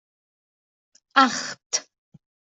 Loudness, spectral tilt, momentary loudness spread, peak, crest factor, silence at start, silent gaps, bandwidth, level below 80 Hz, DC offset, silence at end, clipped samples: -22 LUFS; -1 dB/octave; 9 LU; -2 dBFS; 24 dB; 1.15 s; 1.66-1.70 s; 8.2 kHz; -76 dBFS; under 0.1%; 0.65 s; under 0.1%